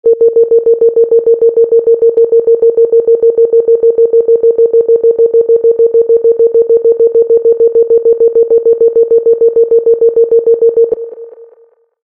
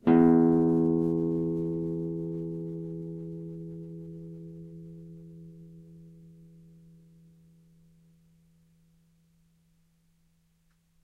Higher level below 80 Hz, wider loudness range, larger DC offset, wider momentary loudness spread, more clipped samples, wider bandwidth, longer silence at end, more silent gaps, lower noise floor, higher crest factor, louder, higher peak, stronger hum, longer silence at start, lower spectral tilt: first, -56 dBFS vs -62 dBFS; second, 0 LU vs 25 LU; neither; second, 1 LU vs 27 LU; neither; second, 1.3 kHz vs 3.6 kHz; second, 0.6 s vs 4.75 s; neither; second, -46 dBFS vs -69 dBFS; second, 8 dB vs 20 dB; first, -8 LUFS vs -28 LUFS; first, 0 dBFS vs -10 dBFS; neither; about the same, 0.05 s vs 0.05 s; about the same, -11 dB/octave vs -11 dB/octave